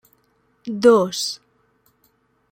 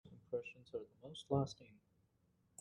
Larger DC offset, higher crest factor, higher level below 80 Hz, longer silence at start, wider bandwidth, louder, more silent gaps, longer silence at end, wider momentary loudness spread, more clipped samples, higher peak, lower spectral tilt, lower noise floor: neither; about the same, 20 dB vs 24 dB; first, -64 dBFS vs -76 dBFS; first, 0.65 s vs 0.05 s; first, 16.5 kHz vs 10.5 kHz; first, -18 LUFS vs -45 LUFS; neither; first, 1.15 s vs 0.85 s; first, 21 LU vs 16 LU; neither; first, -2 dBFS vs -22 dBFS; second, -4 dB/octave vs -6.5 dB/octave; second, -64 dBFS vs -78 dBFS